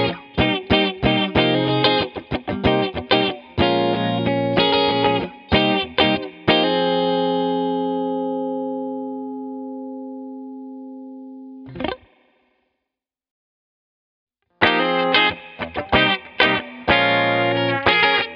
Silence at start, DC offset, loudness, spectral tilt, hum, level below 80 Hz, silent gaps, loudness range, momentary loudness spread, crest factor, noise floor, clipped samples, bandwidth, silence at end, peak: 0 s; under 0.1%; -19 LUFS; -7.5 dB/octave; none; -44 dBFS; 13.31-14.27 s; 17 LU; 17 LU; 20 dB; -84 dBFS; under 0.1%; 6.6 kHz; 0 s; 0 dBFS